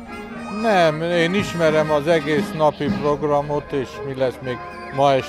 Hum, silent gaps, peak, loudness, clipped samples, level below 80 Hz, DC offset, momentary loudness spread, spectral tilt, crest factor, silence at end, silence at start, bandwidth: none; none; -4 dBFS; -20 LUFS; under 0.1%; -46 dBFS; under 0.1%; 12 LU; -6 dB/octave; 16 dB; 0 s; 0 s; 13.5 kHz